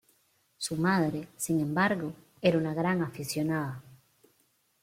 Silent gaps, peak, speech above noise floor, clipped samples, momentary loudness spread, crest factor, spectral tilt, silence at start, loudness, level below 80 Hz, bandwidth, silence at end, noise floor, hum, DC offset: none; -12 dBFS; 42 dB; under 0.1%; 10 LU; 20 dB; -5.5 dB/octave; 0.6 s; -30 LUFS; -68 dBFS; 16.5 kHz; 0.85 s; -71 dBFS; none; under 0.1%